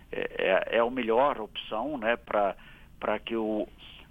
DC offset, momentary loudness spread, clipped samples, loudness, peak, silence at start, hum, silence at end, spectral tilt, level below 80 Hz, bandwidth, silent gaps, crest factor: under 0.1%; 10 LU; under 0.1%; -29 LUFS; -10 dBFS; 0.1 s; none; 0.05 s; -6.5 dB/octave; -54 dBFS; 16 kHz; none; 20 dB